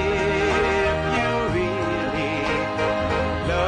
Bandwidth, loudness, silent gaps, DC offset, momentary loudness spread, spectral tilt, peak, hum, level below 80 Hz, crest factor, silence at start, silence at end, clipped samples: 10.5 kHz; -22 LUFS; none; under 0.1%; 4 LU; -5.5 dB/octave; -8 dBFS; none; -38 dBFS; 14 dB; 0 s; 0 s; under 0.1%